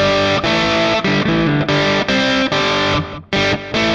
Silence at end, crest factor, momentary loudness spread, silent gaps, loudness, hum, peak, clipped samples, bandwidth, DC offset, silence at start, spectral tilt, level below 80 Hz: 0 s; 12 dB; 3 LU; none; -15 LUFS; none; -4 dBFS; under 0.1%; 9.8 kHz; under 0.1%; 0 s; -5 dB/octave; -38 dBFS